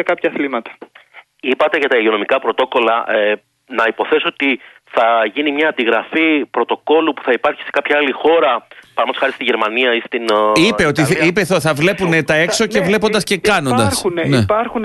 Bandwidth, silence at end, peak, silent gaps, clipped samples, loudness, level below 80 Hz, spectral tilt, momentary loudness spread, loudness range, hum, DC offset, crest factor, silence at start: 12.5 kHz; 0 s; -2 dBFS; none; under 0.1%; -15 LUFS; -50 dBFS; -4.5 dB/octave; 6 LU; 2 LU; none; under 0.1%; 14 dB; 0 s